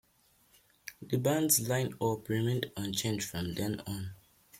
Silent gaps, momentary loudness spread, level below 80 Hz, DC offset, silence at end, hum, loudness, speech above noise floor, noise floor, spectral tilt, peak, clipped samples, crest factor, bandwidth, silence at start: none; 16 LU; -64 dBFS; under 0.1%; 0 s; none; -32 LUFS; 36 dB; -68 dBFS; -4.5 dB/octave; -12 dBFS; under 0.1%; 22 dB; 16.5 kHz; 0.85 s